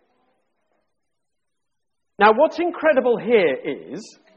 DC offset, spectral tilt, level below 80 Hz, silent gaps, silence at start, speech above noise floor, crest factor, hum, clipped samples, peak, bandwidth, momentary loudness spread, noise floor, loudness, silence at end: under 0.1%; -5.5 dB/octave; -68 dBFS; none; 2.2 s; 63 dB; 18 dB; none; under 0.1%; -4 dBFS; 8.4 kHz; 17 LU; -82 dBFS; -18 LUFS; 0.3 s